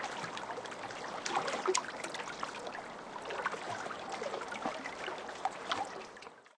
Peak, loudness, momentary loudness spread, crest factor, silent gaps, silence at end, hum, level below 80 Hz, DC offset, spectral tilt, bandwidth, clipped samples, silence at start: -12 dBFS; -39 LUFS; 9 LU; 28 dB; none; 0.05 s; none; -74 dBFS; under 0.1%; -2 dB/octave; 11 kHz; under 0.1%; 0 s